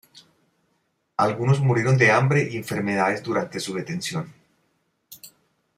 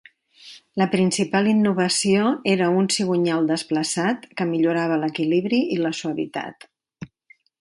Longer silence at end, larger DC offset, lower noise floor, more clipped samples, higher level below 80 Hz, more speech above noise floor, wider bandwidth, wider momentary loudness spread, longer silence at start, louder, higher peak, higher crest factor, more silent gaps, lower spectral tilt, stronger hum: about the same, 0.5 s vs 0.55 s; neither; first, -71 dBFS vs -57 dBFS; neither; about the same, -64 dBFS vs -66 dBFS; first, 49 dB vs 36 dB; first, 15.5 kHz vs 11.5 kHz; first, 18 LU vs 12 LU; second, 0.15 s vs 0.45 s; about the same, -22 LUFS vs -21 LUFS; about the same, -6 dBFS vs -4 dBFS; about the same, 18 dB vs 18 dB; neither; first, -6 dB/octave vs -4.5 dB/octave; neither